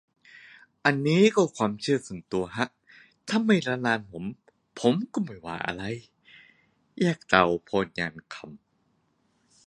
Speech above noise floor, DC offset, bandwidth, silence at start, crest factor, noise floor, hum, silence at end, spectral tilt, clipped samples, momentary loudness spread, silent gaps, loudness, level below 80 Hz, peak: 44 dB; under 0.1%; 11 kHz; 0.85 s; 26 dB; -70 dBFS; none; 1.1 s; -5.5 dB/octave; under 0.1%; 17 LU; none; -26 LUFS; -62 dBFS; -2 dBFS